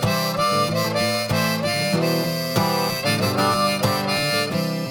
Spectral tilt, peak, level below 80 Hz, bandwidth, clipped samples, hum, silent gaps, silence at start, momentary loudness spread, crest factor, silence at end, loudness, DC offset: -4.5 dB/octave; -6 dBFS; -52 dBFS; over 20 kHz; under 0.1%; none; none; 0 s; 2 LU; 14 dB; 0 s; -21 LUFS; under 0.1%